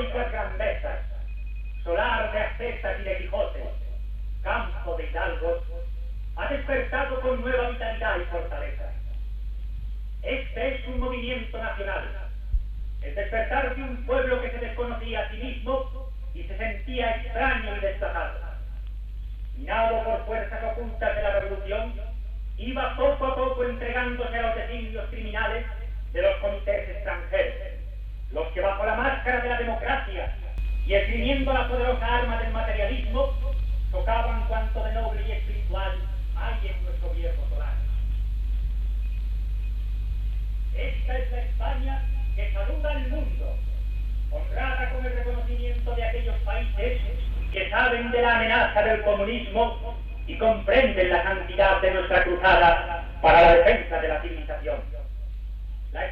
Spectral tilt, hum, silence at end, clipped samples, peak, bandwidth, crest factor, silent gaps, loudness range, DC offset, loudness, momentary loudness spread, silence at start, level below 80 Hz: -7.5 dB/octave; none; 0 s; under 0.1%; -6 dBFS; 4.6 kHz; 20 dB; none; 9 LU; under 0.1%; -27 LUFS; 14 LU; 0 s; -30 dBFS